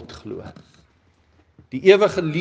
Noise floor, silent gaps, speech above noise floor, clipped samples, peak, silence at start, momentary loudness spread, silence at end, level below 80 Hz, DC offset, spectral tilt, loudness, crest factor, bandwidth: -59 dBFS; none; 41 dB; under 0.1%; 0 dBFS; 0 s; 21 LU; 0 s; -58 dBFS; under 0.1%; -6 dB/octave; -16 LUFS; 22 dB; 7.8 kHz